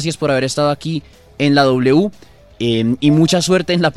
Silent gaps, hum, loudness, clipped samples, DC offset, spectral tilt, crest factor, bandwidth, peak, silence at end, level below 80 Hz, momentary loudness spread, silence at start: none; none; -15 LUFS; under 0.1%; under 0.1%; -5.5 dB/octave; 14 dB; 14 kHz; 0 dBFS; 0.05 s; -48 dBFS; 10 LU; 0 s